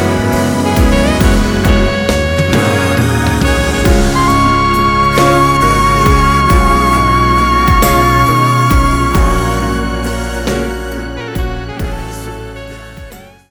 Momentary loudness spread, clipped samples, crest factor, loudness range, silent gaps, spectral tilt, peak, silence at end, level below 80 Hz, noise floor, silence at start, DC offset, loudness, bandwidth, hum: 12 LU; under 0.1%; 10 dB; 9 LU; none; -5.5 dB/octave; 0 dBFS; 0.25 s; -18 dBFS; -33 dBFS; 0 s; under 0.1%; -11 LUFS; over 20 kHz; none